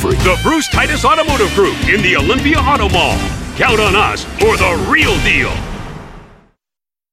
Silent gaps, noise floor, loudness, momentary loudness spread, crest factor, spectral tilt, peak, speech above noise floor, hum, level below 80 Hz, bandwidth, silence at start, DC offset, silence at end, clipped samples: none; -89 dBFS; -12 LUFS; 8 LU; 12 dB; -4.5 dB/octave; 0 dBFS; 77 dB; none; -24 dBFS; 16 kHz; 0 s; under 0.1%; 0.85 s; under 0.1%